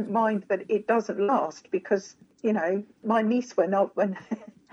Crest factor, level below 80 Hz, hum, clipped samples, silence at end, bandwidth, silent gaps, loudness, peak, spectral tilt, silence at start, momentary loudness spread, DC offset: 16 dB; -82 dBFS; none; under 0.1%; 0.25 s; 7.8 kHz; none; -27 LUFS; -10 dBFS; -6.5 dB/octave; 0 s; 7 LU; under 0.1%